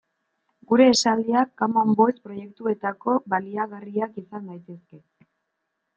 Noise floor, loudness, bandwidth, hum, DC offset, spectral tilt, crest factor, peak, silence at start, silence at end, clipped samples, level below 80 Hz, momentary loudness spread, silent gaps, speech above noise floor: -78 dBFS; -22 LUFS; 9 kHz; none; under 0.1%; -4.5 dB/octave; 20 dB; -4 dBFS; 0.7 s; 1 s; under 0.1%; -70 dBFS; 20 LU; none; 56 dB